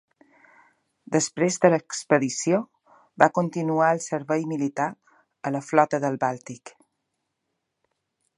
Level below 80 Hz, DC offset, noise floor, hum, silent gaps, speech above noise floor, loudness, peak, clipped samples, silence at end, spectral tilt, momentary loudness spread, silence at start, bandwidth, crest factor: -74 dBFS; under 0.1%; -79 dBFS; none; none; 56 dB; -24 LUFS; 0 dBFS; under 0.1%; 1.7 s; -5 dB/octave; 10 LU; 1.1 s; 11.5 kHz; 26 dB